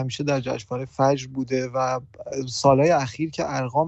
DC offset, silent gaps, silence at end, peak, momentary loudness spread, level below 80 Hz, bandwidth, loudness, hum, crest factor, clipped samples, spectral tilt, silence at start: under 0.1%; none; 0 s; -4 dBFS; 12 LU; -56 dBFS; 8.4 kHz; -23 LUFS; none; 18 dB; under 0.1%; -5.5 dB/octave; 0 s